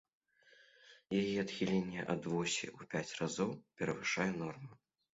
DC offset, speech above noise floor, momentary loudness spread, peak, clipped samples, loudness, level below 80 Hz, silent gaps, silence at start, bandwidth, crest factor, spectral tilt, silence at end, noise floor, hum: under 0.1%; 29 dB; 7 LU; -20 dBFS; under 0.1%; -38 LUFS; -72 dBFS; none; 0.85 s; 7.6 kHz; 20 dB; -4.5 dB/octave; 0.4 s; -67 dBFS; none